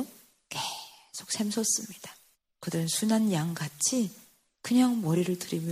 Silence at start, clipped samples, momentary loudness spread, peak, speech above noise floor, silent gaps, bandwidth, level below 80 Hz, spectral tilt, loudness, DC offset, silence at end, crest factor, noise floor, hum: 0 s; under 0.1%; 17 LU; -12 dBFS; 25 dB; none; 15.5 kHz; -72 dBFS; -4 dB/octave; -29 LUFS; under 0.1%; 0 s; 18 dB; -53 dBFS; none